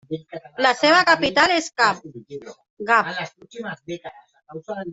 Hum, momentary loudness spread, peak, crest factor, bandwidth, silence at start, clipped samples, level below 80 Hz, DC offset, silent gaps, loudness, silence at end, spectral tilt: none; 23 LU; -2 dBFS; 20 dB; 8.2 kHz; 0.1 s; under 0.1%; -62 dBFS; under 0.1%; 2.70-2.77 s; -18 LUFS; 0 s; -3 dB/octave